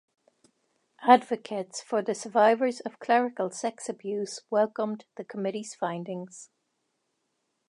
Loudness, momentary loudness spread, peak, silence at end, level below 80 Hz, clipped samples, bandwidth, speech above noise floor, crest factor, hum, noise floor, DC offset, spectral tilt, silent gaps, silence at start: -28 LUFS; 16 LU; -4 dBFS; 1.25 s; -86 dBFS; under 0.1%; 11 kHz; 51 dB; 24 dB; none; -78 dBFS; under 0.1%; -4.5 dB/octave; none; 1 s